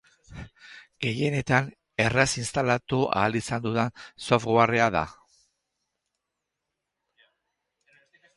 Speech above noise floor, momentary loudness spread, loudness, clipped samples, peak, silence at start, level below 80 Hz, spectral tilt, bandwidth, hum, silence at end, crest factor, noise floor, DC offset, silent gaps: 59 dB; 16 LU; -25 LUFS; under 0.1%; -4 dBFS; 0.3 s; -54 dBFS; -5 dB/octave; 11.5 kHz; none; 3.25 s; 24 dB; -84 dBFS; under 0.1%; none